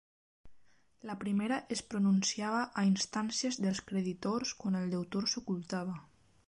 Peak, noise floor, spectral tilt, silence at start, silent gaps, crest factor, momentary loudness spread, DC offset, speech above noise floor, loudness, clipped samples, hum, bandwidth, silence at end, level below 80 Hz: -20 dBFS; -63 dBFS; -4.5 dB/octave; 0.45 s; none; 14 dB; 8 LU; under 0.1%; 29 dB; -34 LUFS; under 0.1%; none; 11 kHz; 0.45 s; -70 dBFS